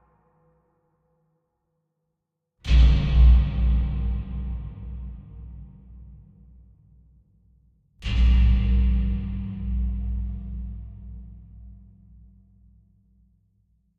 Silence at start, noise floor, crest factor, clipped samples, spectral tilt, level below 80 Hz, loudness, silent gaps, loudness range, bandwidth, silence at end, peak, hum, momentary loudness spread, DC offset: 2.65 s; -81 dBFS; 18 dB; under 0.1%; -8 dB/octave; -24 dBFS; -24 LUFS; none; 19 LU; 4.9 kHz; 2.25 s; -6 dBFS; none; 24 LU; under 0.1%